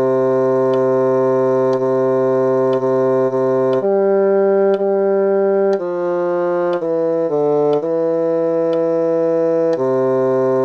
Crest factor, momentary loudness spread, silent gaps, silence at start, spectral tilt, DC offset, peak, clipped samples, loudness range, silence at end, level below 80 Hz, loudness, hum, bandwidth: 10 dB; 3 LU; none; 0 s; -9 dB/octave; under 0.1%; -6 dBFS; under 0.1%; 2 LU; 0 s; -62 dBFS; -16 LUFS; none; 6.4 kHz